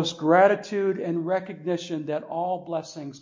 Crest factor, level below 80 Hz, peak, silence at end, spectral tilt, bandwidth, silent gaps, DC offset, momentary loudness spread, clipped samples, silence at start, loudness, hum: 20 dB; -76 dBFS; -6 dBFS; 0.05 s; -5.5 dB/octave; 7.6 kHz; none; under 0.1%; 12 LU; under 0.1%; 0 s; -25 LUFS; none